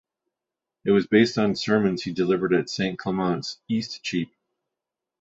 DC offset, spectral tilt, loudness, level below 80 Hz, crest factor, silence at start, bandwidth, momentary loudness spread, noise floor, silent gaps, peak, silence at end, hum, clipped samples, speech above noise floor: under 0.1%; -6 dB/octave; -24 LUFS; -60 dBFS; 20 dB; 0.85 s; 7.8 kHz; 10 LU; -87 dBFS; none; -6 dBFS; 0.95 s; none; under 0.1%; 64 dB